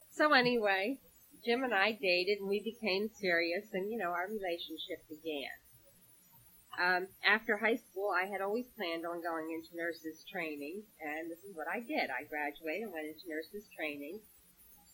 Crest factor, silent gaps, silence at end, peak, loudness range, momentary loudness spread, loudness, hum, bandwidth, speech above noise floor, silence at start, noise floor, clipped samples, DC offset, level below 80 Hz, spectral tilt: 24 dB; none; 0.2 s; -14 dBFS; 7 LU; 14 LU; -35 LUFS; none; 17 kHz; 28 dB; 0 s; -63 dBFS; under 0.1%; under 0.1%; -74 dBFS; -4 dB/octave